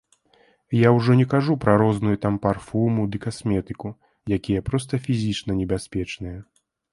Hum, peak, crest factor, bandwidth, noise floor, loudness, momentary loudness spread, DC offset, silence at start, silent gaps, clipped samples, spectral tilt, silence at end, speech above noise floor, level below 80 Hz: none; -2 dBFS; 20 dB; 11.5 kHz; -60 dBFS; -22 LUFS; 15 LU; under 0.1%; 0.7 s; none; under 0.1%; -7.5 dB/octave; 0.5 s; 38 dB; -46 dBFS